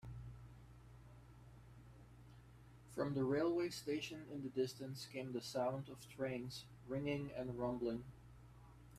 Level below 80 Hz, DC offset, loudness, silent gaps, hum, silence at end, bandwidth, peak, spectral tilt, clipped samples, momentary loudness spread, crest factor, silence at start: -66 dBFS; under 0.1%; -44 LUFS; none; none; 0 s; 15 kHz; -26 dBFS; -6 dB/octave; under 0.1%; 22 LU; 18 dB; 0.05 s